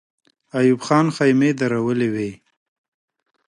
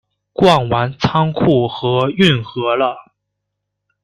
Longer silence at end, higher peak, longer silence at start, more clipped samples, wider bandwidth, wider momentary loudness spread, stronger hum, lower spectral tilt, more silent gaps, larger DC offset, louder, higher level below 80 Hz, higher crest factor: first, 1.15 s vs 1 s; second, -4 dBFS vs 0 dBFS; first, 0.55 s vs 0.4 s; neither; about the same, 11.5 kHz vs 11.5 kHz; first, 11 LU vs 6 LU; second, none vs 50 Hz at -40 dBFS; about the same, -6.5 dB/octave vs -6.5 dB/octave; neither; neither; second, -19 LUFS vs -15 LUFS; second, -64 dBFS vs -46 dBFS; about the same, 16 dB vs 16 dB